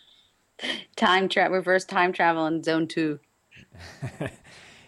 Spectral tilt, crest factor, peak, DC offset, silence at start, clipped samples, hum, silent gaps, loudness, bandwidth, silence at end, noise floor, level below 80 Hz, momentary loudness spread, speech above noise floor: -4.5 dB/octave; 18 dB; -8 dBFS; under 0.1%; 0.6 s; under 0.1%; none; none; -24 LUFS; 12 kHz; 0.55 s; -61 dBFS; -64 dBFS; 16 LU; 37 dB